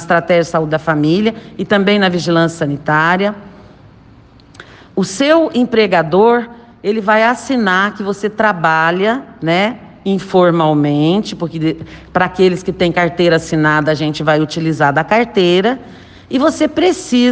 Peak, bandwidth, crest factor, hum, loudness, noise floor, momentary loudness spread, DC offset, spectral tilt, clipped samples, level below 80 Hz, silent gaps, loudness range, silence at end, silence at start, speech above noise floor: 0 dBFS; 9.6 kHz; 14 dB; none; -14 LUFS; -42 dBFS; 8 LU; under 0.1%; -5.5 dB/octave; under 0.1%; -48 dBFS; none; 2 LU; 0 s; 0 s; 29 dB